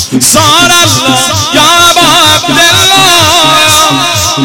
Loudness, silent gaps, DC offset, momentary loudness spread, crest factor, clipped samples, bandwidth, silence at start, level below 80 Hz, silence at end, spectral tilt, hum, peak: -3 LUFS; none; 1%; 4 LU; 6 dB; 2%; over 20 kHz; 0 s; -36 dBFS; 0 s; -2 dB/octave; none; 0 dBFS